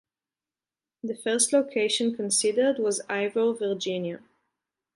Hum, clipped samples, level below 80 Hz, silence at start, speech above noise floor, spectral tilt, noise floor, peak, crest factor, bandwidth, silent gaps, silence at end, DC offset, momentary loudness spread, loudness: none; under 0.1%; -80 dBFS; 1.05 s; over 64 dB; -2.5 dB/octave; under -90 dBFS; -8 dBFS; 20 dB; 11.5 kHz; none; 0.8 s; under 0.1%; 12 LU; -25 LUFS